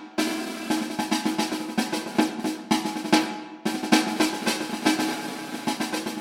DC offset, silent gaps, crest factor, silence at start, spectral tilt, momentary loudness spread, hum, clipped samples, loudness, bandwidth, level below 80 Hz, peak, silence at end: under 0.1%; none; 24 dB; 0 s; -3 dB/octave; 9 LU; none; under 0.1%; -26 LUFS; 16.5 kHz; -68 dBFS; -2 dBFS; 0 s